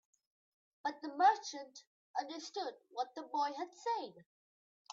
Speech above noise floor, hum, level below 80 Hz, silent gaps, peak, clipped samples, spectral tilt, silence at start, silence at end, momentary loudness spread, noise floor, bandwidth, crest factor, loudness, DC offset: over 52 dB; none; under -90 dBFS; 1.87-2.14 s, 4.26-4.85 s; -18 dBFS; under 0.1%; 0.5 dB/octave; 0.85 s; 0 s; 17 LU; under -90 dBFS; 7.6 kHz; 22 dB; -38 LUFS; under 0.1%